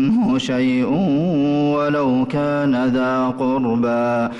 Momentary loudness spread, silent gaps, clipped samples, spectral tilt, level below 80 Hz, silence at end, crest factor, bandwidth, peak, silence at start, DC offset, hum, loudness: 2 LU; none; under 0.1%; -7.5 dB/octave; -50 dBFS; 0 s; 8 dB; 8.6 kHz; -10 dBFS; 0 s; under 0.1%; none; -18 LUFS